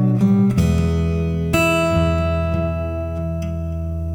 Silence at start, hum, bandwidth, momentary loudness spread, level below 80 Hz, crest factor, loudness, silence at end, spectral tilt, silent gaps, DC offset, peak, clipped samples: 0 s; none; 17.5 kHz; 9 LU; -28 dBFS; 14 dB; -19 LUFS; 0 s; -7 dB/octave; none; under 0.1%; -4 dBFS; under 0.1%